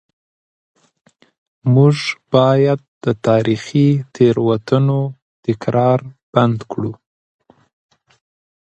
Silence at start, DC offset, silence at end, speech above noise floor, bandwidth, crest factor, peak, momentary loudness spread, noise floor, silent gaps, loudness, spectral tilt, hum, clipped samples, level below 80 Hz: 1.65 s; under 0.1%; 1.7 s; over 75 dB; 9 kHz; 18 dB; 0 dBFS; 11 LU; under -90 dBFS; 2.88-3.01 s, 5.22-5.43 s, 6.23-6.33 s; -16 LUFS; -8 dB/octave; none; under 0.1%; -56 dBFS